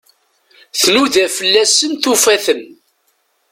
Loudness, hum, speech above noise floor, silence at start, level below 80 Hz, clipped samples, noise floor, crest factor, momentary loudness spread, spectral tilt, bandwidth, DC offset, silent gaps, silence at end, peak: -12 LUFS; none; 49 dB; 0.75 s; -58 dBFS; under 0.1%; -62 dBFS; 16 dB; 8 LU; -0.5 dB/octave; 17 kHz; under 0.1%; none; 0.85 s; 0 dBFS